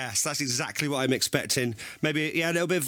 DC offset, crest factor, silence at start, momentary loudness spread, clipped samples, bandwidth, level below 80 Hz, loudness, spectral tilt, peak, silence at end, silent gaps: under 0.1%; 20 dB; 0 s; 3 LU; under 0.1%; over 20 kHz; -66 dBFS; -27 LUFS; -3 dB/octave; -8 dBFS; 0 s; none